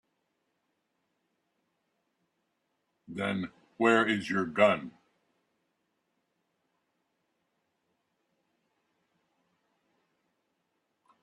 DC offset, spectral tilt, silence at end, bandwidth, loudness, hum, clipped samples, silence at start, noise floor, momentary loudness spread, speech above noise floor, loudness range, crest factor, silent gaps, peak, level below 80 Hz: under 0.1%; -5.5 dB/octave; 6.35 s; 11.5 kHz; -28 LUFS; none; under 0.1%; 3.1 s; -80 dBFS; 17 LU; 52 dB; 12 LU; 28 dB; none; -8 dBFS; -78 dBFS